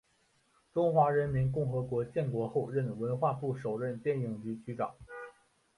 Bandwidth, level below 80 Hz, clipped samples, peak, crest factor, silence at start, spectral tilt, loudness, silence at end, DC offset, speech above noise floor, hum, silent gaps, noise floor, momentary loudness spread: 11 kHz; -62 dBFS; under 0.1%; -14 dBFS; 20 dB; 0.75 s; -9.5 dB/octave; -33 LUFS; 0.45 s; under 0.1%; 40 dB; none; none; -72 dBFS; 12 LU